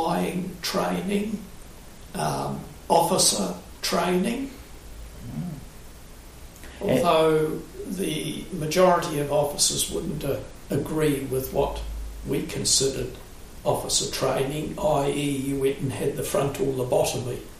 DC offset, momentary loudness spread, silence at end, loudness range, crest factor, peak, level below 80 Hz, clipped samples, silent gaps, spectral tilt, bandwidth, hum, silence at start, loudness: under 0.1%; 17 LU; 0 s; 3 LU; 20 dB; -6 dBFS; -42 dBFS; under 0.1%; none; -4 dB/octave; 15.5 kHz; none; 0 s; -25 LUFS